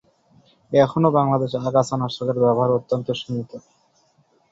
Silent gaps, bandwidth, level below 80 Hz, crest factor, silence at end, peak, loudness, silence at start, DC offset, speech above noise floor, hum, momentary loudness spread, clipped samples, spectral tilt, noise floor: none; 8 kHz; -60 dBFS; 20 dB; 0.95 s; -2 dBFS; -21 LUFS; 0.7 s; under 0.1%; 41 dB; none; 12 LU; under 0.1%; -7 dB/octave; -61 dBFS